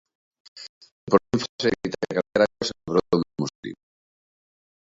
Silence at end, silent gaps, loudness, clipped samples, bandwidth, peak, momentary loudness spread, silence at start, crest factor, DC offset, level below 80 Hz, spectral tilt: 1.15 s; 0.69-0.81 s, 0.91-1.07 s, 1.49-1.59 s, 3.55-3.63 s; -24 LUFS; under 0.1%; 7.8 kHz; -2 dBFS; 20 LU; 0.55 s; 26 dB; under 0.1%; -56 dBFS; -5.5 dB/octave